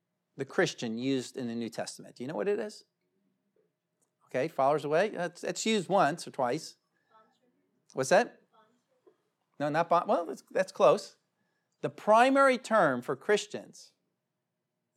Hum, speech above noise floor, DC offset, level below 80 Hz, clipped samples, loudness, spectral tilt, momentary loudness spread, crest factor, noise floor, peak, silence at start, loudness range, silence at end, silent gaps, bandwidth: none; 56 dB; under 0.1%; under -90 dBFS; under 0.1%; -29 LUFS; -4.5 dB/octave; 15 LU; 22 dB; -85 dBFS; -8 dBFS; 0.4 s; 8 LU; 1.15 s; none; 14.5 kHz